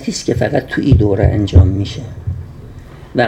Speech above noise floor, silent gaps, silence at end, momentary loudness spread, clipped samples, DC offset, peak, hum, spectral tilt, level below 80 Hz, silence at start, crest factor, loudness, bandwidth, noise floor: 21 dB; none; 0 s; 18 LU; under 0.1%; under 0.1%; 0 dBFS; none; -7 dB/octave; -24 dBFS; 0 s; 14 dB; -14 LUFS; 9.2 kHz; -34 dBFS